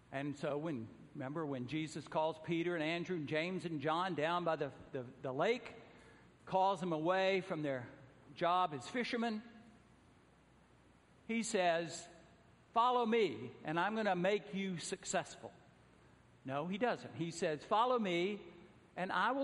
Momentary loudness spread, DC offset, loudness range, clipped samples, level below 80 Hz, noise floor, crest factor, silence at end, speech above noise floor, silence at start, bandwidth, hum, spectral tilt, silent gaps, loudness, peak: 14 LU; under 0.1%; 4 LU; under 0.1%; -76 dBFS; -67 dBFS; 18 dB; 0 s; 29 dB; 0.1 s; 11.5 kHz; none; -5 dB/octave; none; -38 LUFS; -20 dBFS